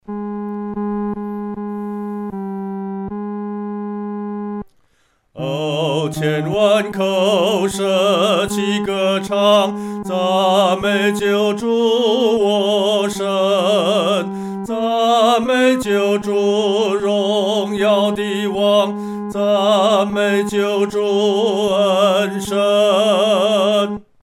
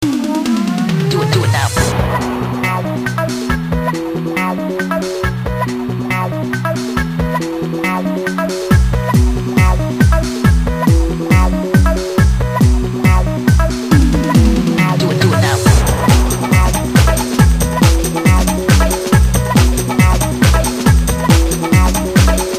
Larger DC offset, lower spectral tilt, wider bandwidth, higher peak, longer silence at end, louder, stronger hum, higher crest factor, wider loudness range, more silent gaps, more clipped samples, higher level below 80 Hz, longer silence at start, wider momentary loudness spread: neither; about the same, -5 dB/octave vs -5.5 dB/octave; about the same, 15.5 kHz vs 15.5 kHz; about the same, -2 dBFS vs 0 dBFS; first, 0.2 s vs 0 s; second, -17 LUFS vs -14 LUFS; neither; about the same, 14 dB vs 12 dB; first, 9 LU vs 6 LU; neither; neither; second, -52 dBFS vs -18 dBFS; about the same, 0.1 s vs 0 s; first, 11 LU vs 6 LU